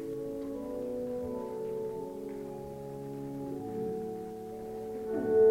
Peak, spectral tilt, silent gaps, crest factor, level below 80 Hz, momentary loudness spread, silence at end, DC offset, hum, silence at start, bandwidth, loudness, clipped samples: -16 dBFS; -8 dB/octave; none; 18 dB; -62 dBFS; 6 LU; 0 s; under 0.1%; none; 0 s; 16 kHz; -37 LUFS; under 0.1%